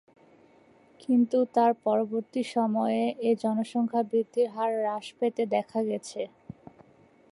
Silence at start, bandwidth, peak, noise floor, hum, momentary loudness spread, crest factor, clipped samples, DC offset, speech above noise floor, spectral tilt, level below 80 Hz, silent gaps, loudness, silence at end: 1.1 s; 11.5 kHz; -12 dBFS; -59 dBFS; none; 13 LU; 16 dB; under 0.1%; under 0.1%; 32 dB; -6 dB/octave; -76 dBFS; none; -28 LUFS; 1.05 s